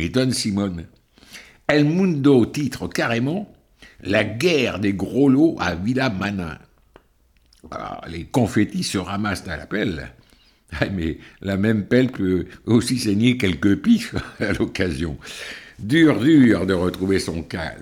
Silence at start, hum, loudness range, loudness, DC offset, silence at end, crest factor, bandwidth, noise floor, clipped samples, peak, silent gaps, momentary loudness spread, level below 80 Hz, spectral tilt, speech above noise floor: 0 s; none; 6 LU; -20 LUFS; under 0.1%; 0 s; 16 dB; 16 kHz; -59 dBFS; under 0.1%; -4 dBFS; none; 16 LU; -44 dBFS; -6 dB/octave; 39 dB